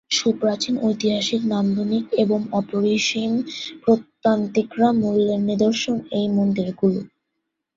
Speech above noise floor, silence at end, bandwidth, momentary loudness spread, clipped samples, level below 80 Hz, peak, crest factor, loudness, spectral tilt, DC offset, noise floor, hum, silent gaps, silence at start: 58 dB; 0.7 s; 7.8 kHz; 4 LU; under 0.1%; -60 dBFS; -4 dBFS; 16 dB; -21 LUFS; -5 dB/octave; under 0.1%; -78 dBFS; none; none; 0.1 s